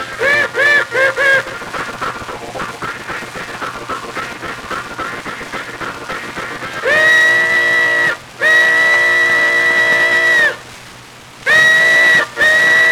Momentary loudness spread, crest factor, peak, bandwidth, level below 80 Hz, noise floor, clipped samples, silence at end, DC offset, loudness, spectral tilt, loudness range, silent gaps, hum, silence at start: 16 LU; 14 dB; 0 dBFS; 17.5 kHz; -50 dBFS; -36 dBFS; under 0.1%; 0 s; under 0.1%; -10 LUFS; -2 dB/octave; 13 LU; none; none; 0 s